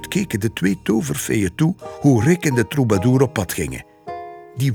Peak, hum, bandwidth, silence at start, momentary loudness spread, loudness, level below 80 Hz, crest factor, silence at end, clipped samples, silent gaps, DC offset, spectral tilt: -2 dBFS; none; 19.5 kHz; 0 s; 17 LU; -19 LUFS; -46 dBFS; 16 dB; 0 s; under 0.1%; none; under 0.1%; -6 dB/octave